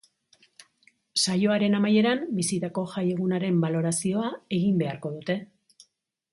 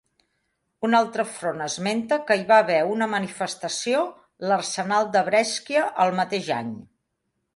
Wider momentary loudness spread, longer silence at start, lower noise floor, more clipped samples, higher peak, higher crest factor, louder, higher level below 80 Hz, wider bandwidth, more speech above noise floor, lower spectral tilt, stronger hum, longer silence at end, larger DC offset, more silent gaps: about the same, 9 LU vs 11 LU; first, 1.15 s vs 0.8 s; second, -69 dBFS vs -77 dBFS; neither; second, -10 dBFS vs -6 dBFS; about the same, 16 dB vs 18 dB; second, -26 LUFS vs -23 LUFS; about the same, -68 dBFS vs -70 dBFS; about the same, 11.5 kHz vs 11.5 kHz; second, 44 dB vs 54 dB; first, -5 dB/octave vs -3.5 dB/octave; neither; about the same, 0.85 s vs 0.75 s; neither; neither